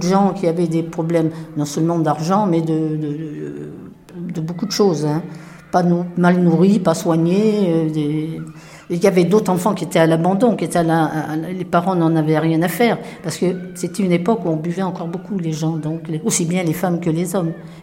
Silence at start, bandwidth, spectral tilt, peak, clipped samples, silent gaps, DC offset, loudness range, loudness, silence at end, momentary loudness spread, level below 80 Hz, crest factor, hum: 0 s; 16.5 kHz; -6.5 dB/octave; -2 dBFS; under 0.1%; none; under 0.1%; 4 LU; -18 LUFS; 0 s; 11 LU; -56 dBFS; 16 dB; none